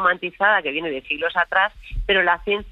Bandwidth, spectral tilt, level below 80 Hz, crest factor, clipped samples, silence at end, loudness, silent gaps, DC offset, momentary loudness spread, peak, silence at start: 5.8 kHz; -6 dB/octave; -36 dBFS; 16 dB; under 0.1%; 0 s; -20 LUFS; none; under 0.1%; 8 LU; -6 dBFS; 0 s